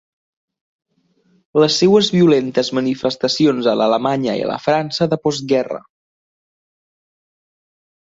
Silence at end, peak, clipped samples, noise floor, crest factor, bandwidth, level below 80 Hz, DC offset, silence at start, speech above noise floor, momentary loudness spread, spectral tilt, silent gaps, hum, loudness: 2.3 s; -2 dBFS; under 0.1%; -60 dBFS; 16 dB; 7.8 kHz; -60 dBFS; under 0.1%; 1.55 s; 44 dB; 7 LU; -5.5 dB/octave; none; none; -16 LUFS